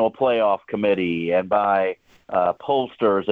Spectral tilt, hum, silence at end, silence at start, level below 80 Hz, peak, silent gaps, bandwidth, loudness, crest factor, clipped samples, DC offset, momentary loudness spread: -8 dB/octave; none; 0 s; 0 s; -64 dBFS; -6 dBFS; none; 4.8 kHz; -21 LUFS; 14 dB; under 0.1%; under 0.1%; 4 LU